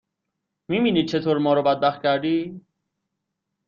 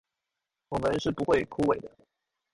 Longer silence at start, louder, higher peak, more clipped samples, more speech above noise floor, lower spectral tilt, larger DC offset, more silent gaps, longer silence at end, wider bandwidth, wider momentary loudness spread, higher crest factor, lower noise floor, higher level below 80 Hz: about the same, 0.7 s vs 0.7 s; first, -22 LUFS vs -29 LUFS; first, -6 dBFS vs -12 dBFS; neither; about the same, 60 dB vs 59 dB; about the same, -7 dB/octave vs -6 dB/octave; neither; neither; first, 1.1 s vs 0.65 s; second, 7.2 kHz vs 11.5 kHz; about the same, 7 LU vs 8 LU; about the same, 18 dB vs 20 dB; second, -80 dBFS vs -87 dBFS; second, -64 dBFS vs -54 dBFS